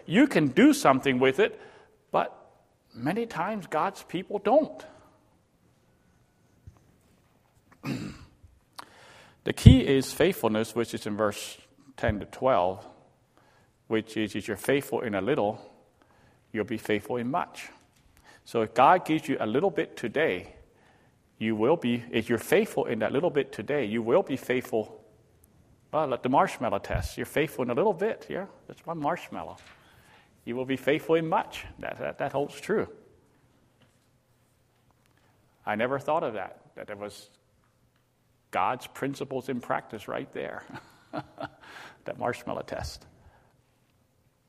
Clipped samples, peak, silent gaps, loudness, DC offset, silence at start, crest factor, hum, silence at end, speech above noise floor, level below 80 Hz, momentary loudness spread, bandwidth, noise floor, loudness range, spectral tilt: under 0.1%; 0 dBFS; none; -28 LUFS; under 0.1%; 0.05 s; 28 dB; none; 1.5 s; 41 dB; -46 dBFS; 19 LU; 15.5 kHz; -68 dBFS; 12 LU; -6 dB/octave